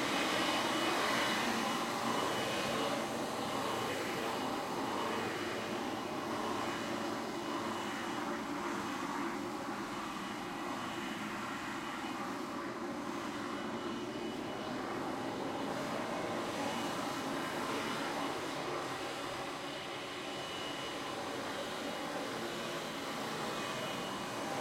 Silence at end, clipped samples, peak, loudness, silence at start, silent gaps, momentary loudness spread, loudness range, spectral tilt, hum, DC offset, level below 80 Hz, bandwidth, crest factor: 0 s; under 0.1%; -20 dBFS; -38 LUFS; 0 s; none; 7 LU; 5 LU; -3.5 dB/octave; none; under 0.1%; -68 dBFS; 16 kHz; 18 dB